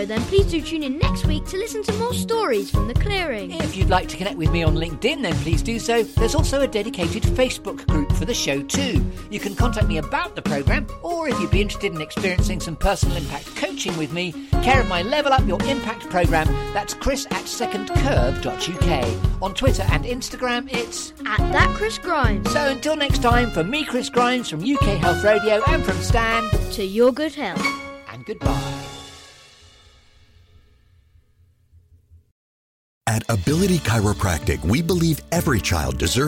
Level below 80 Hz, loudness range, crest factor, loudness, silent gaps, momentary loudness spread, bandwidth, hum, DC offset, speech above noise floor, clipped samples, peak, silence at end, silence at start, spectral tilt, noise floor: -28 dBFS; 5 LU; 20 dB; -21 LUFS; 32.32-33.01 s; 7 LU; 16.5 kHz; none; under 0.1%; 37 dB; under 0.1%; -2 dBFS; 0 s; 0 s; -5 dB/octave; -58 dBFS